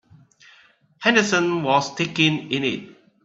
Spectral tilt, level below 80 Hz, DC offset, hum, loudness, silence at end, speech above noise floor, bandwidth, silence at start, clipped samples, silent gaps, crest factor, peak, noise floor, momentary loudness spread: -4 dB/octave; -64 dBFS; under 0.1%; none; -20 LUFS; 0.35 s; 35 dB; 8 kHz; 1 s; under 0.1%; none; 20 dB; -2 dBFS; -55 dBFS; 7 LU